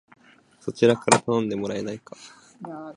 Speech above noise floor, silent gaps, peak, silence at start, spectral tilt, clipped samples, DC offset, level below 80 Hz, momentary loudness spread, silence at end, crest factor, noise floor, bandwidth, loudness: 32 dB; none; 0 dBFS; 0.65 s; -4.5 dB/octave; under 0.1%; under 0.1%; -64 dBFS; 22 LU; 0.05 s; 26 dB; -56 dBFS; 11.5 kHz; -23 LUFS